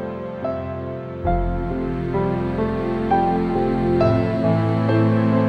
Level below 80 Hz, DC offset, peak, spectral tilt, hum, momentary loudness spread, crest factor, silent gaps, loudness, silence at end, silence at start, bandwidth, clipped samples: -34 dBFS; under 0.1%; -6 dBFS; -9.5 dB/octave; none; 10 LU; 14 dB; none; -21 LUFS; 0 s; 0 s; 5.8 kHz; under 0.1%